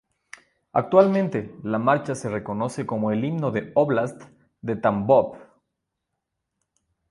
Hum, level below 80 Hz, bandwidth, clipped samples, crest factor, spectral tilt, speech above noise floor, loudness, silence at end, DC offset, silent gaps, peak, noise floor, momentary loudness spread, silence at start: none; -60 dBFS; 11.5 kHz; under 0.1%; 22 dB; -7.5 dB/octave; 59 dB; -23 LUFS; 1.7 s; under 0.1%; none; -2 dBFS; -81 dBFS; 11 LU; 0.75 s